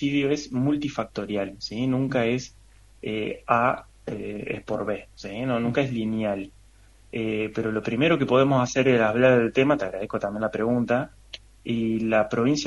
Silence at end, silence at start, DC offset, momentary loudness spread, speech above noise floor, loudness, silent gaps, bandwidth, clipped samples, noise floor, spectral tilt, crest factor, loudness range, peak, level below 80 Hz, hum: 0 s; 0 s; under 0.1%; 13 LU; 29 dB; -25 LUFS; none; 11.5 kHz; under 0.1%; -53 dBFS; -6 dB/octave; 20 dB; 7 LU; -4 dBFS; -54 dBFS; none